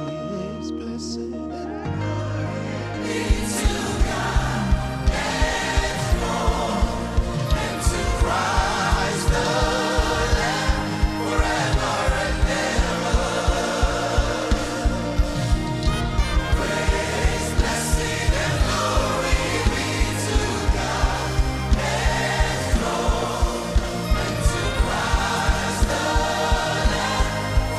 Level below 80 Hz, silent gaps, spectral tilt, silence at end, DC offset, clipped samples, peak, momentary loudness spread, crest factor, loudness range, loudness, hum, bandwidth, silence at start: -24 dBFS; none; -4.5 dB/octave; 0 s; under 0.1%; under 0.1%; -4 dBFS; 5 LU; 16 dB; 2 LU; -23 LUFS; none; 14 kHz; 0 s